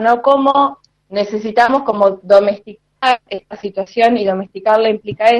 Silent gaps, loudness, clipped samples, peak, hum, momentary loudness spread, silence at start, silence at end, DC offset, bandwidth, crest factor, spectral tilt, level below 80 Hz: none; -14 LUFS; under 0.1%; 0 dBFS; none; 12 LU; 0 s; 0 s; under 0.1%; 10 kHz; 14 dB; -5.5 dB/octave; -56 dBFS